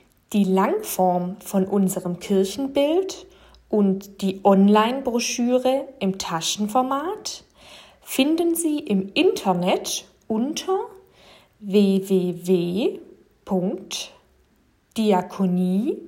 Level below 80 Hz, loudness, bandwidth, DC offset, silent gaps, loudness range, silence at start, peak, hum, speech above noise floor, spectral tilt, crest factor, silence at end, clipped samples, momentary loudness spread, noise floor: -60 dBFS; -22 LUFS; 16.5 kHz; under 0.1%; none; 3 LU; 0.3 s; -4 dBFS; none; 40 dB; -5.5 dB/octave; 20 dB; 0 s; under 0.1%; 10 LU; -61 dBFS